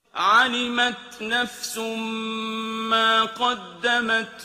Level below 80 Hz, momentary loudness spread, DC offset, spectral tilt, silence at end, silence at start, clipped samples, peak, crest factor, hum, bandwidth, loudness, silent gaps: -66 dBFS; 10 LU; under 0.1%; -2 dB/octave; 0 s; 0.15 s; under 0.1%; -6 dBFS; 18 dB; none; 15.5 kHz; -22 LUFS; none